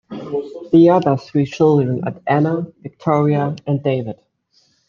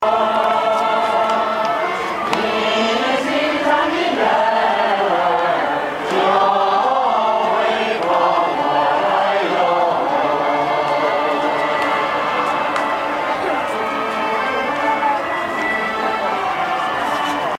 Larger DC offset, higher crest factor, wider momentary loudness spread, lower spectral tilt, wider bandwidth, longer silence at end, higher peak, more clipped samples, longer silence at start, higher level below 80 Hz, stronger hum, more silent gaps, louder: neither; about the same, 16 dB vs 16 dB; first, 13 LU vs 4 LU; first, -9 dB/octave vs -4 dB/octave; second, 7.2 kHz vs 16 kHz; first, 0.75 s vs 0 s; about the same, -2 dBFS vs 0 dBFS; neither; about the same, 0.1 s vs 0 s; about the same, -60 dBFS vs -56 dBFS; neither; neither; about the same, -17 LUFS vs -17 LUFS